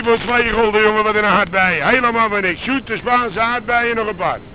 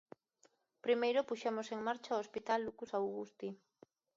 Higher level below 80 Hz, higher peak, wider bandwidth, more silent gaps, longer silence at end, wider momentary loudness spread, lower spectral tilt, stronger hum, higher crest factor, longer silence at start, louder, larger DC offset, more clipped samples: first, -40 dBFS vs -82 dBFS; first, 0 dBFS vs -22 dBFS; second, 4 kHz vs 7.6 kHz; neither; second, 0 s vs 0.6 s; second, 6 LU vs 12 LU; first, -8 dB/octave vs -2.5 dB/octave; neither; about the same, 16 dB vs 18 dB; second, 0 s vs 0.85 s; first, -15 LUFS vs -39 LUFS; first, 0.4% vs under 0.1%; neither